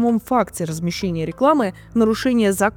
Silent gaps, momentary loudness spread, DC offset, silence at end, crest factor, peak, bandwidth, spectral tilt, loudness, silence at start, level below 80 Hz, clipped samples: none; 7 LU; under 0.1%; 0.05 s; 14 dB; -4 dBFS; 19.5 kHz; -5.5 dB/octave; -19 LUFS; 0 s; -46 dBFS; under 0.1%